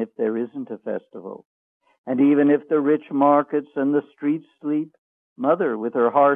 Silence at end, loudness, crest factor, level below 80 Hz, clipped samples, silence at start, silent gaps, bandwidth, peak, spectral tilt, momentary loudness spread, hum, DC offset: 0 s; -22 LUFS; 18 dB; -78 dBFS; under 0.1%; 0 s; 1.45-1.80 s, 1.98-2.04 s, 4.98-5.36 s; 3.7 kHz; -4 dBFS; -10 dB/octave; 17 LU; none; under 0.1%